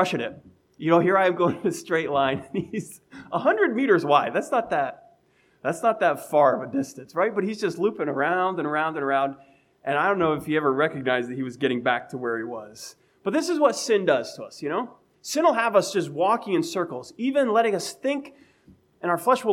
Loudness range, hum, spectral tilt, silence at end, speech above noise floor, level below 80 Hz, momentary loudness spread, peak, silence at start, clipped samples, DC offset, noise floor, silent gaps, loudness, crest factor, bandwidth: 2 LU; none; -5 dB/octave; 0 s; 39 dB; -70 dBFS; 12 LU; -2 dBFS; 0 s; under 0.1%; under 0.1%; -62 dBFS; none; -24 LUFS; 22 dB; 16.5 kHz